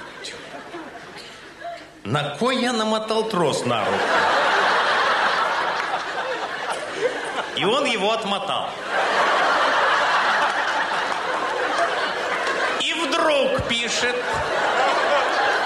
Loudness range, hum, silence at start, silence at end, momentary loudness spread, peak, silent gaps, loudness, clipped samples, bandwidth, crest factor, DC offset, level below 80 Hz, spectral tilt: 4 LU; none; 0 s; 0 s; 16 LU; -8 dBFS; none; -21 LUFS; under 0.1%; 15.5 kHz; 14 dB; under 0.1%; -54 dBFS; -3 dB/octave